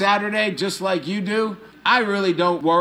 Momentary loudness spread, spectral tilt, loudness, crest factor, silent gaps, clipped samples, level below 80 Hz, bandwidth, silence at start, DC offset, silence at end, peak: 6 LU; -4.5 dB/octave; -21 LUFS; 16 dB; none; under 0.1%; -66 dBFS; 15 kHz; 0 s; under 0.1%; 0 s; -4 dBFS